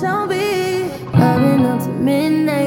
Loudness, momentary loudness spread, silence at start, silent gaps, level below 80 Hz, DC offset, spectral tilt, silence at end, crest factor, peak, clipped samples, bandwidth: -16 LUFS; 5 LU; 0 s; none; -48 dBFS; under 0.1%; -7 dB/octave; 0 s; 16 dB; 0 dBFS; under 0.1%; 17 kHz